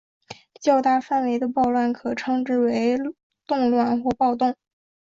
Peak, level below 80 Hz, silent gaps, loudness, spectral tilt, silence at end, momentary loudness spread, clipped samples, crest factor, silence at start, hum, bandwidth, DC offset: -8 dBFS; -60 dBFS; 3.23-3.30 s; -22 LUFS; -5.5 dB/octave; 0.6 s; 7 LU; under 0.1%; 16 dB; 0.3 s; none; 7.4 kHz; under 0.1%